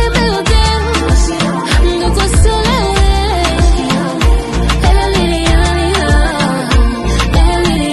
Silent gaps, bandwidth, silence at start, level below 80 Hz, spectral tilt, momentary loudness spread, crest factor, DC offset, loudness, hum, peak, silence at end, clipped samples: none; 12.5 kHz; 0 s; -14 dBFS; -5 dB/octave; 3 LU; 10 dB; under 0.1%; -12 LUFS; none; 0 dBFS; 0 s; under 0.1%